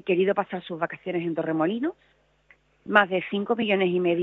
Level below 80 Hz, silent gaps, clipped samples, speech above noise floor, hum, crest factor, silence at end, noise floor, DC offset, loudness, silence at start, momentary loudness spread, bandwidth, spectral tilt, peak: -70 dBFS; none; under 0.1%; 36 dB; none; 24 dB; 0 s; -61 dBFS; under 0.1%; -25 LUFS; 0.05 s; 9 LU; 4.1 kHz; -8.5 dB/octave; -2 dBFS